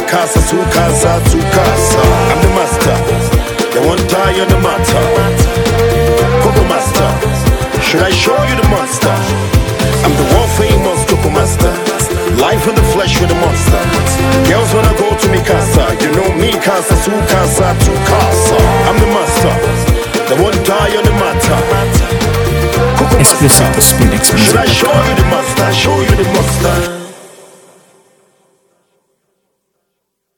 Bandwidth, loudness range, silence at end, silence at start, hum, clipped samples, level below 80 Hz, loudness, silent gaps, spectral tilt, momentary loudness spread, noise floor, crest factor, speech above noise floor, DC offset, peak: over 20 kHz; 3 LU; 3.1 s; 0 s; none; 0.3%; -20 dBFS; -10 LUFS; none; -4.5 dB/octave; 4 LU; -69 dBFS; 10 dB; 60 dB; under 0.1%; 0 dBFS